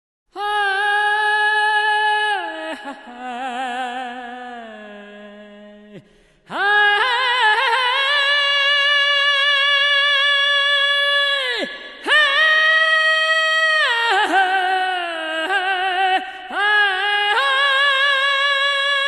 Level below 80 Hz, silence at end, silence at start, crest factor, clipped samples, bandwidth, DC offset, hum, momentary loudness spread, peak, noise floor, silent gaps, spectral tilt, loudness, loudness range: -64 dBFS; 0 s; 0.35 s; 14 dB; under 0.1%; 12 kHz; under 0.1%; none; 14 LU; -4 dBFS; -52 dBFS; none; 0 dB/octave; -16 LUFS; 11 LU